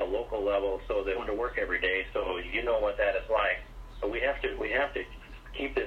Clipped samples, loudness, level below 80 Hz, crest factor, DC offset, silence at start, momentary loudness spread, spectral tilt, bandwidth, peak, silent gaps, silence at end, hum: under 0.1%; -30 LUFS; -44 dBFS; 18 dB; under 0.1%; 0 s; 9 LU; -5.5 dB/octave; 9.6 kHz; -14 dBFS; none; 0 s; none